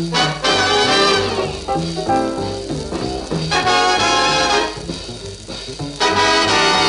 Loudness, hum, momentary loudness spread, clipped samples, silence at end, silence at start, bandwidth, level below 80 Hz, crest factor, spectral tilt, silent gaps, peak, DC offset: -16 LUFS; none; 14 LU; under 0.1%; 0 s; 0 s; 11.5 kHz; -38 dBFS; 14 dB; -3 dB/octave; none; -2 dBFS; under 0.1%